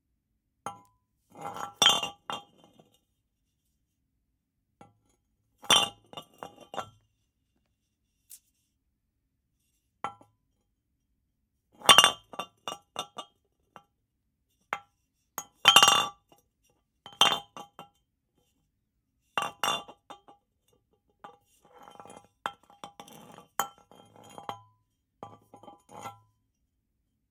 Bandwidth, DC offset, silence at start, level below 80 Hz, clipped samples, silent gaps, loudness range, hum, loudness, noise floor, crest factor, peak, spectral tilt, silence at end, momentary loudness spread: 17 kHz; under 0.1%; 0.65 s; -74 dBFS; under 0.1%; none; 24 LU; none; -23 LUFS; -79 dBFS; 32 dB; -2 dBFS; 0.5 dB/octave; 1.2 s; 27 LU